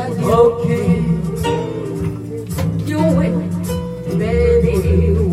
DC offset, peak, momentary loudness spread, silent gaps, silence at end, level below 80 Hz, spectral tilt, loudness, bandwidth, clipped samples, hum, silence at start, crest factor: under 0.1%; 0 dBFS; 10 LU; none; 0 s; -30 dBFS; -8 dB/octave; -17 LUFS; 15 kHz; under 0.1%; none; 0 s; 14 dB